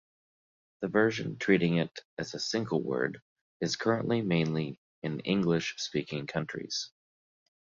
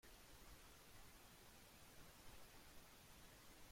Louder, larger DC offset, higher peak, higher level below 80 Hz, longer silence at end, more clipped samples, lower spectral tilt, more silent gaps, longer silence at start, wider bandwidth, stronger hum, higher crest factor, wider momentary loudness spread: first, -31 LUFS vs -64 LUFS; neither; first, -10 dBFS vs -50 dBFS; about the same, -66 dBFS vs -70 dBFS; first, 0.75 s vs 0 s; neither; first, -5.5 dB/octave vs -3 dB/octave; first, 2.05-2.17 s, 3.22-3.60 s, 4.78-5.02 s vs none; first, 0.8 s vs 0.05 s; second, 7.6 kHz vs 16.5 kHz; neither; first, 22 dB vs 14 dB; first, 11 LU vs 1 LU